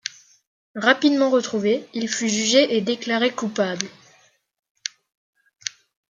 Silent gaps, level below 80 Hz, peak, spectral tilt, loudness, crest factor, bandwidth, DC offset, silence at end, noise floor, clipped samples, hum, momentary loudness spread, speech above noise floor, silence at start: 0.47-0.74 s, 4.59-4.63 s, 4.70-4.75 s, 5.17-5.33 s; -74 dBFS; -2 dBFS; -3 dB/octave; -21 LUFS; 22 dB; 9.6 kHz; under 0.1%; 0.5 s; -59 dBFS; under 0.1%; none; 16 LU; 38 dB; 0.05 s